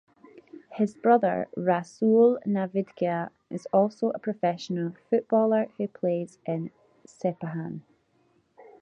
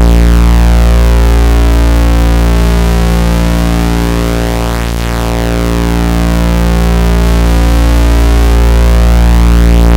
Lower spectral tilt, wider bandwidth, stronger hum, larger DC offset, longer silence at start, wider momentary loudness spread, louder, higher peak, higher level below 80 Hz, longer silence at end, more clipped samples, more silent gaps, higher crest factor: first, -8 dB/octave vs -6 dB/octave; second, 9.2 kHz vs 16.5 kHz; neither; neither; first, 0.7 s vs 0 s; first, 12 LU vs 5 LU; second, -27 LUFS vs -9 LUFS; second, -8 dBFS vs 0 dBFS; second, -74 dBFS vs -8 dBFS; first, 0.2 s vs 0 s; neither; neither; first, 20 dB vs 6 dB